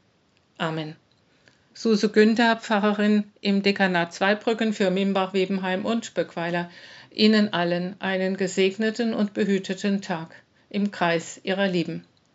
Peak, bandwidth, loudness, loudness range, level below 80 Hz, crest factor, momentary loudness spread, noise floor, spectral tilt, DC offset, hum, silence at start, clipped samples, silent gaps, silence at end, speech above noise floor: -4 dBFS; 8 kHz; -24 LUFS; 4 LU; -78 dBFS; 20 dB; 12 LU; -64 dBFS; -4 dB/octave; under 0.1%; none; 0.6 s; under 0.1%; none; 0.35 s; 40 dB